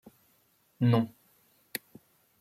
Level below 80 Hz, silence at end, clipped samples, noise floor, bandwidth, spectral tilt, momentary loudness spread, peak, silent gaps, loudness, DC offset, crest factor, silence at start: -72 dBFS; 1.35 s; under 0.1%; -69 dBFS; 16.5 kHz; -7 dB/octave; 14 LU; -10 dBFS; none; -31 LUFS; under 0.1%; 22 dB; 0.8 s